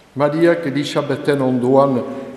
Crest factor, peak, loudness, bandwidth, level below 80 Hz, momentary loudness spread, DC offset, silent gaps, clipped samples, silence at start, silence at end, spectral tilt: 16 dB; 0 dBFS; -17 LUFS; 13 kHz; -60 dBFS; 6 LU; under 0.1%; none; under 0.1%; 0.15 s; 0 s; -7 dB/octave